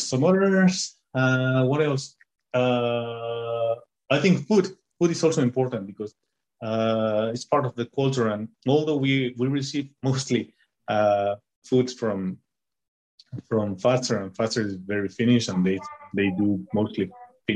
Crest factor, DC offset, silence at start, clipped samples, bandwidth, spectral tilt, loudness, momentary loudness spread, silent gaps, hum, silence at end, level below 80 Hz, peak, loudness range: 18 dB; under 0.1%; 0 s; under 0.1%; 10 kHz; -6 dB/octave; -24 LUFS; 11 LU; 11.56-11.62 s, 12.88-13.18 s; none; 0 s; -66 dBFS; -6 dBFS; 3 LU